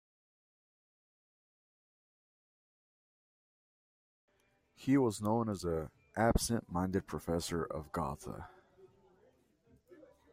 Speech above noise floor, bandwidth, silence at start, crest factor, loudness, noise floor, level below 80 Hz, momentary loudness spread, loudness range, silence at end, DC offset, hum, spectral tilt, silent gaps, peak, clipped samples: 39 dB; 16 kHz; 4.8 s; 22 dB; -35 LUFS; -74 dBFS; -52 dBFS; 13 LU; 7 LU; 0.3 s; under 0.1%; none; -5.5 dB/octave; none; -18 dBFS; under 0.1%